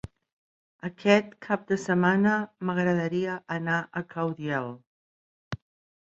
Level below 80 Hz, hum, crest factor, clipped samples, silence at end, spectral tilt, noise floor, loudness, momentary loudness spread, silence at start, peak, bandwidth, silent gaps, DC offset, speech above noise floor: -62 dBFS; none; 22 dB; under 0.1%; 0.45 s; -6.5 dB/octave; under -90 dBFS; -27 LUFS; 17 LU; 0.85 s; -6 dBFS; 8 kHz; 4.87-5.51 s; under 0.1%; over 63 dB